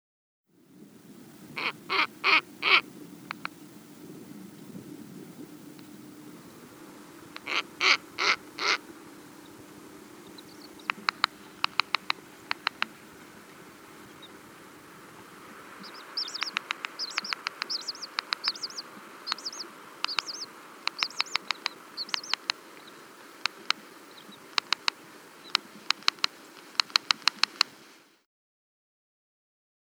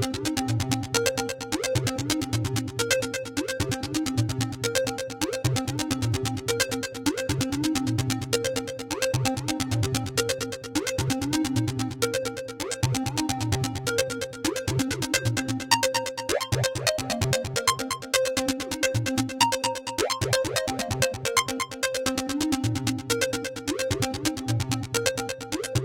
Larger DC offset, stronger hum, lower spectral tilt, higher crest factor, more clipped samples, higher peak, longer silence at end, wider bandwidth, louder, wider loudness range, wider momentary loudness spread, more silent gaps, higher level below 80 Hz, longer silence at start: neither; neither; second, -0.5 dB/octave vs -4 dB/octave; first, 34 dB vs 24 dB; neither; first, 0 dBFS vs -4 dBFS; first, 2.15 s vs 0 s; first, over 20 kHz vs 17 kHz; about the same, -29 LUFS vs -27 LUFS; first, 12 LU vs 2 LU; first, 24 LU vs 5 LU; neither; second, -80 dBFS vs -48 dBFS; first, 1.1 s vs 0 s